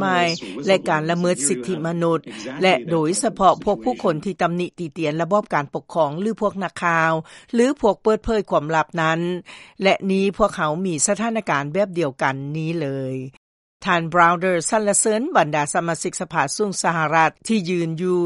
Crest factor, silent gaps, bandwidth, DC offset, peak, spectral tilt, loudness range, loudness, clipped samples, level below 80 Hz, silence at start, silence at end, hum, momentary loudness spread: 20 dB; 13.37-13.80 s; 11.5 kHz; under 0.1%; 0 dBFS; -4.5 dB/octave; 3 LU; -20 LUFS; under 0.1%; -50 dBFS; 0 s; 0 s; none; 8 LU